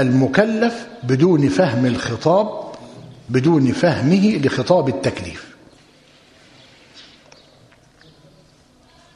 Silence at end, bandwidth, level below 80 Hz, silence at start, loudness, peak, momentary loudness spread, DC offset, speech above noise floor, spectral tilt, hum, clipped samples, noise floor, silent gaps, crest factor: 2.15 s; 11 kHz; -54 dBFS; 0 s; -17 LUFS; 0 dBFS; 17 LU; under 0.1%; 35 dB; -7 dB/octave; none; under 0.1%; -52 dBFS; none; 20 dB